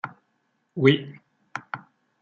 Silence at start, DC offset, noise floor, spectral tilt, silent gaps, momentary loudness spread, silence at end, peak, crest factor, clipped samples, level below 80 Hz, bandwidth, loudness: 0.05 s; under 0.1%; -72 dBFS; -7.5 dB/octave; none; 19 LU; 0.45 s; -4 dBFS; 24 dB; under 0.1%; -70 dBFS; 7.2 kHz; -23 LUFS